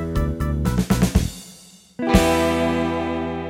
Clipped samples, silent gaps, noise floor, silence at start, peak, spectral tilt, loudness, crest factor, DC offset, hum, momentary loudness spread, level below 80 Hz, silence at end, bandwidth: under 0.1%; none; -46 dBFS; 0 s; 0 dBFS; -6 dB/octave; -21 LUFS; 20 dB; under 0.1%; none; 13 LU; -28 dBFS; 0 s; 17 kHz